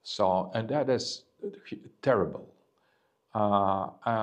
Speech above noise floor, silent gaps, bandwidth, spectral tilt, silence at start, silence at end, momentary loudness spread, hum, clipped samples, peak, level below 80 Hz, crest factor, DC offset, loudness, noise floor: 43 dB; none; 10 kHz; -5.5 dB/octave; 0.05 s; 0 s; 15 LU; none; under 0.1%; -10 dBFS; -68 dBFS; 20 dB; under 0.1%; -29 LUFS; -72 dBFS